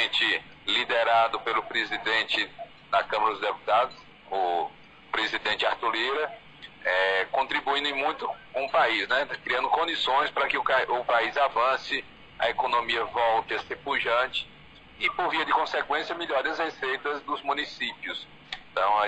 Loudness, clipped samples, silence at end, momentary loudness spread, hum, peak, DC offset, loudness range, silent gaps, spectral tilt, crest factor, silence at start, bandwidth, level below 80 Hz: -26 LUFS; under 0.1%; 0 s; 9 LU; none; -12 dBFS; under 0.1%; 3 LU; none; -2.5 dB/octave; 16 dB; 0 s; 9.2 kHz; -62 dBFS